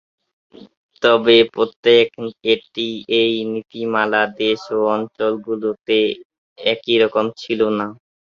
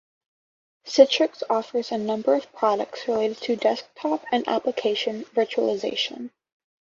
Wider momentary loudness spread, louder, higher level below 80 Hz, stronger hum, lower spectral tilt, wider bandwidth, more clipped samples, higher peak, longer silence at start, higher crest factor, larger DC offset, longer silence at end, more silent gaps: about the same, 10 LU vs 9 LU; first, -18 LUFS vs -24 LUFS; first, -62 dBFS vs -72 dBFS; neither; first, -5.5 dB/octave vs -3.5 dB/octave; about the same, 7 kHz vs 7.6 kHz; neither; about the same, -2 dBFS vs -2 dBFS; second, 0.6 s vs 0.85 s; about the same, 18 dB vs 22 dB; neither; second, 0.35 s vs 0.65 s; first, 0.77-0.89 s, 1.76-1.83 s, 6.25-6.30 s, 6.38-6.56 s vs none